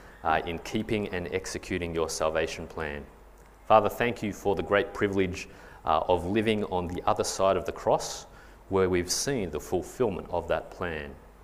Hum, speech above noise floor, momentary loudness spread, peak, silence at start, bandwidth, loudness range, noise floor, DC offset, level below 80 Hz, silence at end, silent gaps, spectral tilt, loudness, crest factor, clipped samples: none; 24 dB; 9 LU; -6 dBFS; 0 s; 15.5 kHz; 3 LU; -52 dBFS; under 0.1%; -50 dBFS; 0 s; none; -4.5 dB/octave; -28 LUFS; 22 dB; under 0.1%